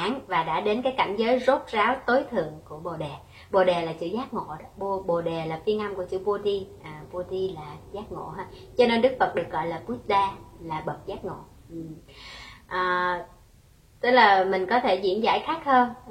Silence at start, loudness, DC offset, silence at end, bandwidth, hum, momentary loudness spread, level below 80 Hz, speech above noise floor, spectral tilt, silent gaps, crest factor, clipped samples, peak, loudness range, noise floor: 0 s; -25 LUFS; under 0.1%; 0 s; 13 kHz; none; 18 LU; -54 dBFS; 30 dB; -6 dB/octave; none; 22 dB; under 0.1%; -4 dBFS; 8 LU; -55 dBFS